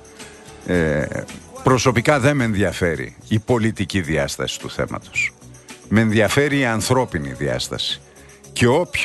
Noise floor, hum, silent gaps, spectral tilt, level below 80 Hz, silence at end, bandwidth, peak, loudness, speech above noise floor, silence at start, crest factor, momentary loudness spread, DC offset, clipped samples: -41 dBFS; none; none; -5 dB/octave; -42 dBFS; 0 s; 12.5 kHz; -2 dBFS; -20 LUFS; 22 dB; 0.05 s; 18 dB; 13 LU; under 0.1%; under 0.1%